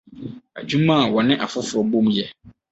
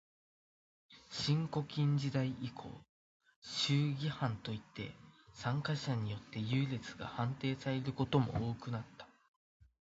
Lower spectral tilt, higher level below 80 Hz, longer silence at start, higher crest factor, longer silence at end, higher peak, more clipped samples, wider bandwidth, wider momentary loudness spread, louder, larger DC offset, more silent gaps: about the same, -5.5 dB/octave vs -5.5 dB/octave; first, -58 dBFS vs -64 dBFS; second, 0.1 s vs 0.9 s; about the same, 18 dB vs 22 dB; second, 0.2 s vs 0.85 s; first, -4 dBFS vs -18 dBFS; neither; about the same, 8.2 kHz vs 7.6 kHz; first, 18 LU vs 14 LU; first, -19 LUFS vs -38 LUFS; neither; second, none vs 2.89-3.20 s, 3.36-3.42 s